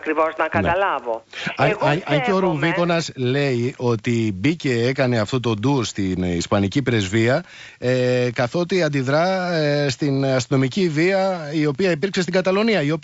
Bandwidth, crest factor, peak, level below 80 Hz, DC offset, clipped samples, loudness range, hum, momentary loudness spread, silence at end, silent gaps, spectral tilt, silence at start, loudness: 8 kHz; 14 dB; -6 dBFS; -52 dBFS; under 0.1%; under 0.1%; 1 LU; none; 4 LU; 0.05 s; none; -6 dB/octave; 0 s; -20 LUFS